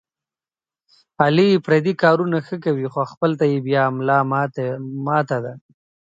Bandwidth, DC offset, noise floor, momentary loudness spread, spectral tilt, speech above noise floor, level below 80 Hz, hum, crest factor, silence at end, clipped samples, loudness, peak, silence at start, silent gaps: 7.8 kHz; under 0.1%; under -90 dBFS; 9 LU; -8 dB/octave; over 71 dB; -66 dBFS; none; 20 dB; 0.55 s; under 0.1%; -19 LUFS; 0 dBFS; 1.2 s; 3.17-3.21 s